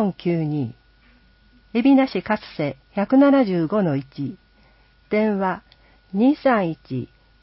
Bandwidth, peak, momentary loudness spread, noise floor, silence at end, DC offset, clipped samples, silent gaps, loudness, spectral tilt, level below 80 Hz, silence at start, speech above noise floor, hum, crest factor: 5.8 kHz; -6 dBFS; 15 LU; -55 dBFS; 0.35 s; under 0.1%; under 0.1%; none; -21 LUFS; -12 dB/octave; -56 dBFS; 0 s; 35 dB; none; 16 dB